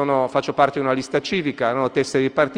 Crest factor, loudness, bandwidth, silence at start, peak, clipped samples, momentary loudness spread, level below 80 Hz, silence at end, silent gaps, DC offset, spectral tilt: 16 dB; -21 LUFS; 10.5 kHz; 0 s; -4 dBFS; under 0.1%; 3 LU; -58 dBFS; 0 s; none; under 0.1%; -5.5 dB/octave